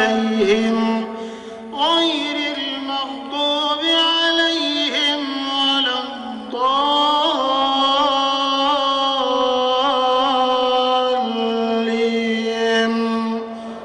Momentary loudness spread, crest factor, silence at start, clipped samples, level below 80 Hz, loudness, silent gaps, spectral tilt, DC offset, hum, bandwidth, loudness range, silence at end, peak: 8 LU; 14 dB; 0 s; under 0.1%; -58 dBFS; -18 LUFS; none; -3.5 dB/octave; under 0.1%; none; 10 kHz; 2 LU; 0 s; -4 dBFS